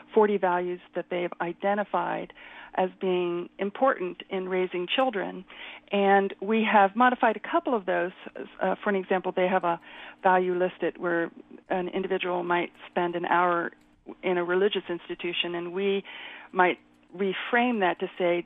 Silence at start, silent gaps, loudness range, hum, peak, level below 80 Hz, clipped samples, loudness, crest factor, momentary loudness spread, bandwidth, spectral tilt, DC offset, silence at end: 0.1 s; none; 4 LU; none; -8 dBFS; -70 dBFS; under 0.1%; -27 LUFS; 20 dB; 12 LU; 4 kHz; -8.5 dB/octave; under 0.1%; 0.05 s